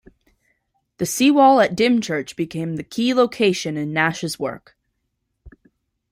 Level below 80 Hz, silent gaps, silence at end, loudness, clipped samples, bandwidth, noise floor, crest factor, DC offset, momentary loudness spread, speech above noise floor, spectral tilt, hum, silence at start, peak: -58 dBFS; none; 0.6 s; -19 LUFS; under 0.1%; 16 kHz; -74 dBFS; 18 dB; under 0.1%; 14 LU; 56 dB; -4.5 dB/octave; none; 1 s; -2 dBFS